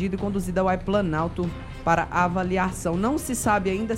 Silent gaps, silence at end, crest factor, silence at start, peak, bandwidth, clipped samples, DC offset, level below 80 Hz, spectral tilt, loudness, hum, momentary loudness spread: none; 0 s; 18 dB; 0 s; -6 dBFS; 16 kHz; under 0.1%; under 0.1%; -40 dBFS; -5.5 dB/octave; -24 LUFS; none; 5 LU